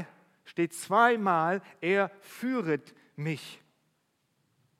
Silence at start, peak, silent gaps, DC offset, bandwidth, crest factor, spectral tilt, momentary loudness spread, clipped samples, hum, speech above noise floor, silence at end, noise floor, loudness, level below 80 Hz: 0 s; -8 dBFS; none; under 0.1%; 16 kHz; 22 dB; -5.5 dB/octave; 15 LU; under 0.1%; none; 47 dB; 1.25 s; -75 dBFS; -29 LUFS; -80 dBFS